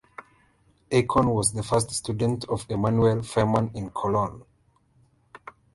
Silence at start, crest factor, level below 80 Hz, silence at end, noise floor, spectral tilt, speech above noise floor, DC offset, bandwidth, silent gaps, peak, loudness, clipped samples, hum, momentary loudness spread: 0.2 s; 18 dB; -50 dBFS; 0.25 s; -64 dBFS; -5.5 dB/octave; 40 dB; under 0.1%; 11.5 kHz; none; -8 dBFS; -25 LUFS; under 0.1%; none; 23 LU